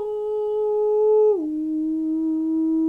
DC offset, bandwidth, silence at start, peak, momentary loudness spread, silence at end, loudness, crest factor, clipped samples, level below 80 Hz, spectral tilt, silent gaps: under 0.1%; 3.1 kHz; 0 s; -12 dBFS; 7 LU; 0 s; -22 LUFS; 10 dB; under 0.1%; -60 dBFS; -8.5 dB/octave; none